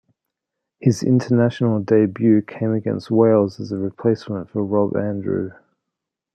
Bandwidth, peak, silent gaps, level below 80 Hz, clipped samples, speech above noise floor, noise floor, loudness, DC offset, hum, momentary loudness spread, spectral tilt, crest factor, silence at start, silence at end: 9.2 kHz; -2 dBFS; none; -64 dBFS; under 0.1%; 64 dB; -82 dBFS; -19 LUFS; under 0.1%; none; 9 LU; -8 dB/octave; 18 dB; 0.8 s; 0.8 s